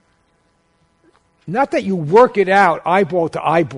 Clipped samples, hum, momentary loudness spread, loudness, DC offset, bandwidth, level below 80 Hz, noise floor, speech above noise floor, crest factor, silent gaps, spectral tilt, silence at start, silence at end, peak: under 0.1%; none; 7 LU; -15 LUFS; under 0.1%; 11 kHz; -56 dBFS; -61 dBFS; 46 dB; 16 dB; none; -6.5 dB/octave; 1.45 s; 0 s; 0 dBFS